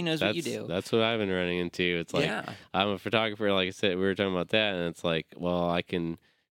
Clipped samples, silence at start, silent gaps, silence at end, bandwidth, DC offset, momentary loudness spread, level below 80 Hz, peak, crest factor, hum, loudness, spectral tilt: under 0.1%; 0 s; none; 0.35 s; 16.5 kHz; under 0.1%; 7 LU; -62 dBFS; -8 dBFS; 22 dB; none; -29 LUFS; -5 dB/octave